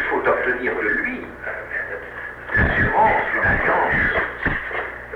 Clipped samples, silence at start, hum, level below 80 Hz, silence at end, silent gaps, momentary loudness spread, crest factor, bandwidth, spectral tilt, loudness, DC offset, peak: under 0.1%; 0 s; 60 Hz at -45 dBFS; -36 dBFS; 0 s; none; 13 LU; 14 dB; 12.5 kHz; -7.5 dB/octave; -20 LUFS; under 0.1%; -6 dBFS